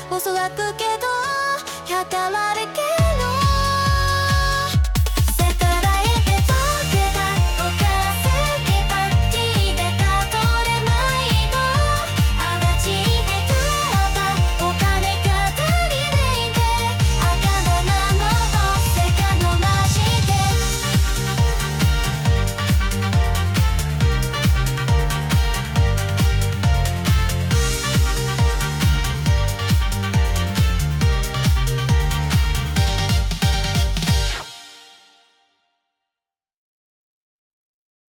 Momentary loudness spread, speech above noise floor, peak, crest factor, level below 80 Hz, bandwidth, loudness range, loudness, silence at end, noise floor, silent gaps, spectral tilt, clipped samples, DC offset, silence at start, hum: 3 LU; 66 dB; -6 dBFS; 12 dB; -24 dBFS; 18 kHz; 2 LU; -19 LUFS; 3.3 s; -88 dBFS; none; -4.5 dB/octave; under 0.1%; under 0.1%; 0 s; none